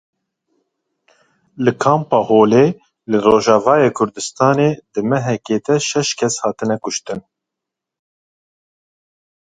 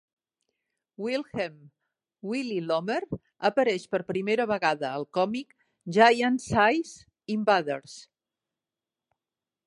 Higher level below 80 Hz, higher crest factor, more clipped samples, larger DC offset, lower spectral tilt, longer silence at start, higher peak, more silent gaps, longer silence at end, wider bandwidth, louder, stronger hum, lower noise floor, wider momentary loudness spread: first, -56 dBFS vs -62 dBFS; second, 18 dB vs 24 dB; neither; neither; about the same, -5 dB/octave vs -5 dB/octave; first, 1.6 s vs 1 s; first, 0 dBFS vs -6 dBFS; neither; first, 2.35 s vs 1.65 s; second, 9.4 kHz vs 11.5 kHz; first, -16 LUFS vs -27 LUFS; neither; second, -83 dBFS vs under -90 dBFS; second, 9 LU vs 16 LU